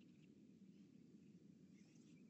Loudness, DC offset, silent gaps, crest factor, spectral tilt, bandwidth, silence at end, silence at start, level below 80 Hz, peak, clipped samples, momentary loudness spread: -67 LUFS; under 0.1%; none; 12 dB; -6.5 dB/octave; 8.2 kHz; 0 s; 0 s; under -90 dBFS; -54 dBFS; under 0.1%; 1 LU